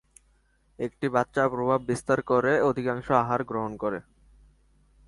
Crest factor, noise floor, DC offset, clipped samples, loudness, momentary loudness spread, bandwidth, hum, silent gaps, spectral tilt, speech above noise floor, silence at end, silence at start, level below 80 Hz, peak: 22 dB; -65 dBFS; under 0.1%; under 0.1%; -26 LUFS; 9 LU; 11.5 kHz; none; none; -6.5 dB/octave; 39 dB; 1.05 s; 0.8 s; -58 dBFS; -6 dBFS